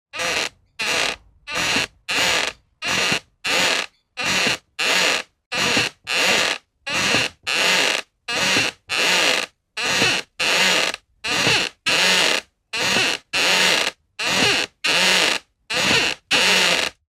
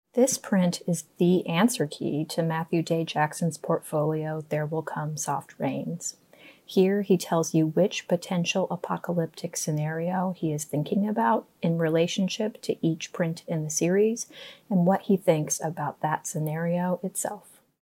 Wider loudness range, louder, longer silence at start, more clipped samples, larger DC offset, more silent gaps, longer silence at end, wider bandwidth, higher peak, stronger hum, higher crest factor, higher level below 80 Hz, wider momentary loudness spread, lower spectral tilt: about the same, 3 LU vs 3 LU; first, -18 LUFS vs -27 LUFS; about the same, 0.15 s vs 0.15 s; neither; neither; first, 5.46-5.51 s vs none; second, 0.2 s vs 0.45 s; about the same, 16.5 kHz vs 16 kHz; first, -4 dBFS vs -8 dBFS; neither; about the same, 18 dB vs 18 dB; first, -56 dBFS vs -74 dBFS; about the same, 10 LU vs 8 LU; second, -1 dB/octave vs -5.5 dB/octave